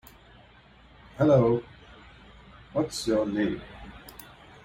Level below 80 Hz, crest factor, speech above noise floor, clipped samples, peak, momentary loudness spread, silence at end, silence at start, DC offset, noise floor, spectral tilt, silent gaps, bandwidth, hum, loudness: -54 dBFS; 18 dB; 30 dB; under 0.1%; -10 dBFS; 26 LU; 0.55 s; 1.15 s; under 0.1%; -55 dBFS; -6.5 dB/octave; none; 16 kHz; none; -26 LUFS